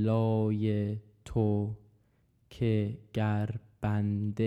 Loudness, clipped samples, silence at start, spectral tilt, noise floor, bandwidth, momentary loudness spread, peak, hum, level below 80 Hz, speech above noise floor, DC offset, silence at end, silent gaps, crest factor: -31 LUFS; under 0.1%; 0 s; -9.5 dB/octave; -69 dBFS; 7.8 kHz; 8 LU; -16 dBFS; none; -56 dBFS; 39 dB; under 0.1%; 0 s; none; 14 dB